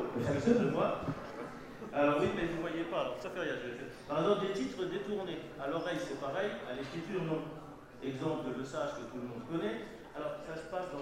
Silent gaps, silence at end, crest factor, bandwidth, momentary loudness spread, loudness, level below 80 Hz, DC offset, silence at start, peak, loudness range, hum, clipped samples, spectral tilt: none; 0 s; 20 dB; 16 kHz; 13 LU; -36 LUFS; -62 dBFS; under 0.1%; 0 s; -16 dBFS; 6 LU; none; under 0.1%; -6.5 dB/octave